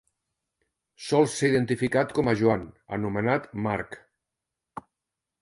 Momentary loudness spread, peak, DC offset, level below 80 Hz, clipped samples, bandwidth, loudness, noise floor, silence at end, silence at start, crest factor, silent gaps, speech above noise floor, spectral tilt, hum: 21 LU; -8 dBFS; under 0.1%; -58 dBFS; under 0.1%; 11.5 kHz; -26 LUFS; -86 dBFS; 0.6 s; 1 s; 20 dB; none; 61 dB; -6 dB/octave; none